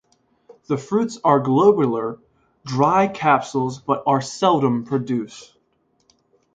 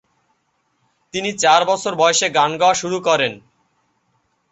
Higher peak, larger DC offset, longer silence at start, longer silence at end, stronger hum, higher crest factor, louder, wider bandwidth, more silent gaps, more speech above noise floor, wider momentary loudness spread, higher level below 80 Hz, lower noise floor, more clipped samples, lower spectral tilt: about the same, -2 dBFS vs -2 dBFS; neither; second, 0.5 s vs 1.15 s; about the same, 1.1 s vs 1.15 s; neither; about the same, 20 dB vs 18 dB; second, -20 LUFS vs -17 LUFS; about the same, 9.2 kHz vs 8.4 kHz; neither; second, 46 dB vs 50 dB; about the same, 11 LU vs 9 LU; about the same, -62 dBFS vs -64 dBFS; about the same, -66 dBFS vs -67 dBFS; neither; first, -6.5 dB/octave vs -2 dB/octave